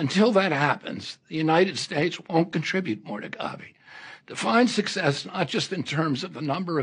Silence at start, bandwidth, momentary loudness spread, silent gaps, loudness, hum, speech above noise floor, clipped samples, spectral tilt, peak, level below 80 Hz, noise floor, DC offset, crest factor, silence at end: 0 s; 10 kHz; 15 LU; none; -25 LUFS; none; 21 dB; under 0.1%; -5 dB/octave; -6 dBFS; -70 dBFS; -46 dBFS; under 0.1%; 18 dB; 0 s